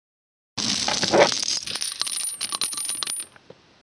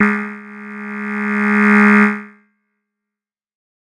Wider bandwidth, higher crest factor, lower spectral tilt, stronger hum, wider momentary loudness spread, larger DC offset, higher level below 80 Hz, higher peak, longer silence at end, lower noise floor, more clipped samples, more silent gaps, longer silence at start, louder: about the same, 10.5 kHz vs 10 kHz; first, 24 dB vs 16 dB; second, -1 dB/octave vs -7.5 dB/octave; neither; second, 9 LU vs 20 LU; neither; about the same, -62 dBFS vs -64 dBFS; about the same, -2 dBFS vs -2 dBFS; second, 0.55 s vs 1.55 s; second, -51 dBFS vs -86 dBFS; neither; neither; first, 0.55 s vs 0 s; second, -23 LUFS vs -14 LUFS